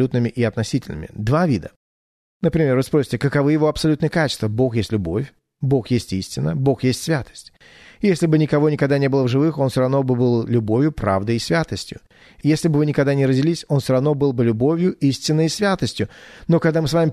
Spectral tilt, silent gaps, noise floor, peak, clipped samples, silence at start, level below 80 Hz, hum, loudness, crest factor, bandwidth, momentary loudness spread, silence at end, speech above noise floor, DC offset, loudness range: -6.5 dB/octave; 1.76-2.40 s; under -90 dBFS; -4 dBFS; under 0.1%; 0 s; -46 dBFS; none; -19 LUFS; 14 dB; 13.5 kHz; 7 LU; 0 s; over 71 dB; under 0.1%; 3 LU